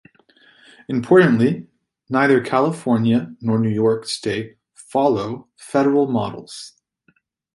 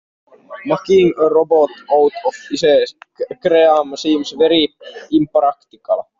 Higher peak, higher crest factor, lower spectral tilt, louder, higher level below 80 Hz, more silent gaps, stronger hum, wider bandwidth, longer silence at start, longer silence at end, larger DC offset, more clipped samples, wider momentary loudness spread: about the same, -2 dBFS vs -2 dBFS; about the same, 18 dB vs 14 dB; first, -6.5 dB/octave vs -5 dB/octave; second, -19 LUFS vs -15 LUFS; about the same, -58 dBFS vs -58 dBFS; neither; neither; first, 11.5 kHz vs 7.6 kHz; first, 0.9 s vs 0.5 s; first, 0.85 s vs 0.2 s; neither; neither; first, 16 LU vs 11 LU